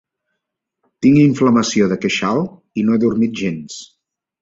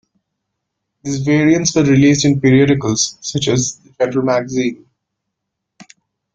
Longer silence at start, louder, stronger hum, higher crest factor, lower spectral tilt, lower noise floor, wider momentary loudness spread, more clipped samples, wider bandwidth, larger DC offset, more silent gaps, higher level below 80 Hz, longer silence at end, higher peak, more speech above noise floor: about the same, 1 s vs 1.05 s; about the same, -16 LUFS vs -15 LUFS; neither; about the same, 16 dB vs 16 dB; about the same, -6 dB/octave vs -5 dB/octave; about the same, -78 dBFS vs -77 dBFS; first, 13 LU vs 10 LU; neither; second, 7.8 kHz vs 9.2 kHz; neither; neither; about the same, -52 dBFS vs -50 dBFS; about the same, 0.55 s vs 0.5 s; about the same, -2 dBFS vs 0 dBFS; about the same, 63 dB vs 63 dB